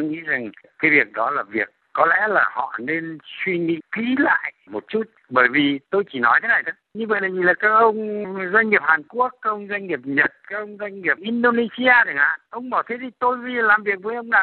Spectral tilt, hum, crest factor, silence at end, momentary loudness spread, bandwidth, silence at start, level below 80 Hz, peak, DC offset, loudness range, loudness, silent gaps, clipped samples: -8.5 dB/octave; none; 20 dB; 0 s; 11 LU; 4.4 kHz; 0 s; -70 dBFS; -2 dBFS; under 0.1%; 3 LU; -20 LUFS; none; under 0.1%